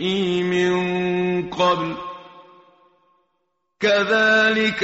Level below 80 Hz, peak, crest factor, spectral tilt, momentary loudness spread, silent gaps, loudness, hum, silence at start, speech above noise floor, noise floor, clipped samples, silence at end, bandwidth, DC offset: -58 dBFS; -6 dBFS; 16 dB; -3 dB/octave; 12 LU; none; -19 LUFS; none; 0 s; 54 dB; -73 dBFS; under 0.1%; 0 s; 8 kHz; under 0.1%